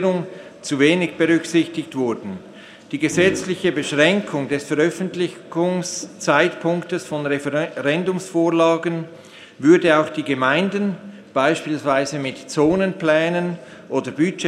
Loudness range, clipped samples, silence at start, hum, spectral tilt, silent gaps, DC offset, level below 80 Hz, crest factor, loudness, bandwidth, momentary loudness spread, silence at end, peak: 3 LU; under 0.1%; 0 s; none; -5 dB/octave; none; under 0.1%; -60 dBFS; 20 dB; -20 LUFS; 12.5 kHz; 10 LU; 0 s; 0 dBFS